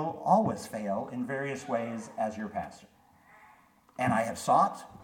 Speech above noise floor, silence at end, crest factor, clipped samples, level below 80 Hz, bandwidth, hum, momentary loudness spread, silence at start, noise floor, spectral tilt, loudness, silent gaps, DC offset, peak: 30 dB; 0 s; 22 dB; under 0.1%; -68 dBFS; 17.5 kHz; none; 12 LU; 0 s; -61 dBFS; -6 dB/octave; -30 LUFS; none; under 0.1%; -10 dBFS